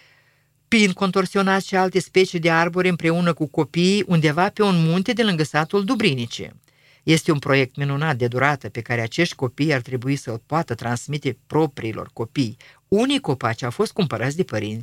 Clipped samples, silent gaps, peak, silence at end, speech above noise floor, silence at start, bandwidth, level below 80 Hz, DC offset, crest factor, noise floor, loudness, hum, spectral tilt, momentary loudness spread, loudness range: under 0.1%; none; 0 dBFS; 0 s; 41 dB; 0.7 s; 16 kHz; -58 dBFS; under 0.1%; 20 dB; -62 dBFS; -21 LUFS; none; -5.5 dB/octave; 8 LU; 5 LU